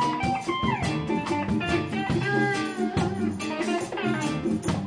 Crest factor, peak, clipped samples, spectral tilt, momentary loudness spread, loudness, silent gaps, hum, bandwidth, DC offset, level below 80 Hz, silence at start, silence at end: 14 dB; -12 dBFS; under 0.1%; -5.5 dB/octave; 3 LU; -27 LUFS; none; none; 10 kHz; under 0.1%; -48 dBFS; 0 s; 0 s